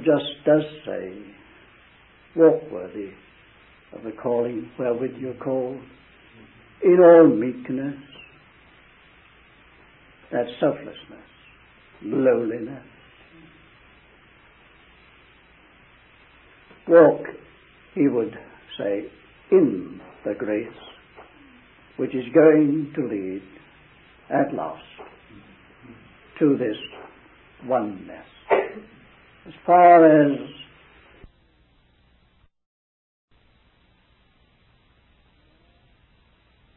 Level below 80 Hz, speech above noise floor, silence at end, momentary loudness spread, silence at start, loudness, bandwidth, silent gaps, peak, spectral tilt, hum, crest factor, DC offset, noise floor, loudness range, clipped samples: -62 dBFS; 41 dB; 6.15 s; 25 LU; 0 s; -20 LUFS; 4 kHz; none; -2 dBFS; -11 dB/octave; none; 22 dB; under 0.1%; -61 dBFS; 11 LU; under 0.1%